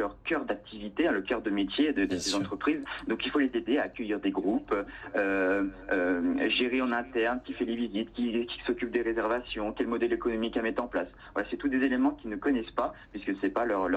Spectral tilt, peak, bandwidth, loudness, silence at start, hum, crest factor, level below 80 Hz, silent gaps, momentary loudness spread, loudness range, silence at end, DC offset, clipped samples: -4.5 dB/octave; -14 dBFS; 9.6 kHz; -30 LUFS; 0 s; none; 16 dB; -54 dBFS; none; 6 LU; 2 LU; 0 s; under 0.1%; under 0.1%